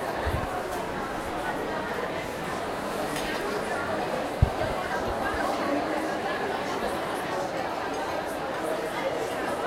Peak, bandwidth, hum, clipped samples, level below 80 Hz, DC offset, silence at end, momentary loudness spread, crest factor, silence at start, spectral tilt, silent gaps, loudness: -6 dBFS; 16 kHz; none; under 0.1%; -44 dBFS; under 0.1%; 0 s; 4 LU; 24 dB; 0 s; -5 dB/octave; none; -29 LUFS